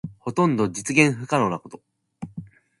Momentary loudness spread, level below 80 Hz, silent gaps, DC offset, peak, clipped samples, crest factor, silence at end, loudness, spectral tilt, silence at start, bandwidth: 19 LU; -60 dBFS; none; under 0.1%; -2 dBFS; under 0.1%; 22 dB; 0.35 s; -21 LUFS; -5.5 dB/octave; 0.05 s; 11.5 kHz